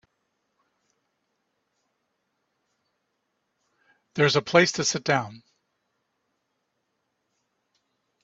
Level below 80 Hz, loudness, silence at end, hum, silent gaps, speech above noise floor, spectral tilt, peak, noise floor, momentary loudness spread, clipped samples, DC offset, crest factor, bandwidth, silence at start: -70 dBFS; -22 LUFS; 2.85 s; none; none; 54 dB; -3.5 dB/octave; -2 dBFS; -77 dBFS; 13 LU; under 0.1%; under 0.1%; 28 dB; 8.2 kHz; 4.15 s